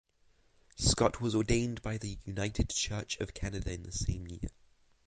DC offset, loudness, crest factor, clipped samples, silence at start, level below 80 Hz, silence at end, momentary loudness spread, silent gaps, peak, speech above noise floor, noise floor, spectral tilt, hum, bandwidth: under 0.1%; -34 LUFS; 22 dB; under 0.1%; 0.75 s; -44 dBFS; 0.55 s; 11 LU; none; -12 dBFS; 34 dB; -68 dBFS; -4.5 dB/octave; none; 9.8 kHz